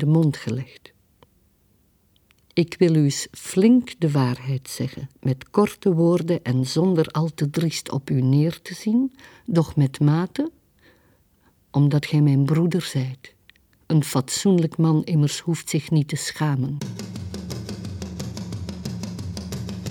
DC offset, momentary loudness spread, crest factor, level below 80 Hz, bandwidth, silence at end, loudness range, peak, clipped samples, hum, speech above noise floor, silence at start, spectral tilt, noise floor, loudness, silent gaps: under 0.1%; 13 LU; 18 dB; -52 dBFS; 18 kHz; 0 s; 4 LU; -4 dBFS; under 0.1%; none; 41 dB; 0 s; -6.5 dB/octave; -62 dBFS; -23 LUFS; none